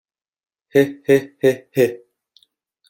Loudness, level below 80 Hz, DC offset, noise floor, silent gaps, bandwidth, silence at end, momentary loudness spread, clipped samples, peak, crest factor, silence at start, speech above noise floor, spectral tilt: -18 LUFS; -64 dBFS; under 0.1%; -62 dBFS; none; 17 kHz; 0.95 s; 4 LU; under 0.1%; -2 dBFS; 18 dB; 0.75 s; 45 dB; -6 dB/octave